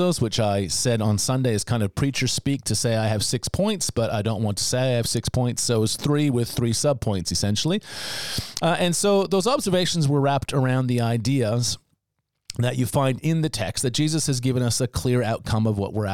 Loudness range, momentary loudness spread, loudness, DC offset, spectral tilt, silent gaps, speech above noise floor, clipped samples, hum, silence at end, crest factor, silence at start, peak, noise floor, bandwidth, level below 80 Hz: 2 LU; 4 LU; -23 LUFS; 0.6%; -5 dB/octave; none; 55 dB; under 0.1%; none; 0 s; 16 dB; 0 s; -6 dBFS; -78 dBFS; 18 kHz; -48 dBFS